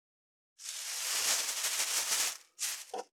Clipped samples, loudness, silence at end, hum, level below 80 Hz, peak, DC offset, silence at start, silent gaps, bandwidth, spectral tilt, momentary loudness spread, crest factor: under 0.1%; -32 LUFS; 0.15 s; none; -88 dBFS; -18 dBFS; under 0.1%; 0.6 s; none; over 20 kHz; 3.5 dB/octave; 11 LU; 20 dB